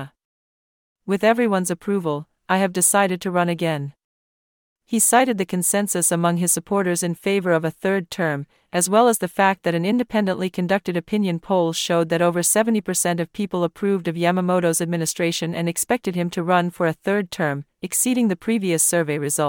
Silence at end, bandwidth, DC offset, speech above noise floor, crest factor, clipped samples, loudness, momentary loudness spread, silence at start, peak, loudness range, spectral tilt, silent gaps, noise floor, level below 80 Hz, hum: 0 s; 18 kHz; under 0.1%; over 70 dB; 18 dB; under 0.1%; -20 LUFS; 7 LU; 0 s; -2 dBFS; 2 LU; -4 dB/octave; 0.25-0.96 s, 4.04-4.76 s; under -90 dBFS; -62 dBFS; none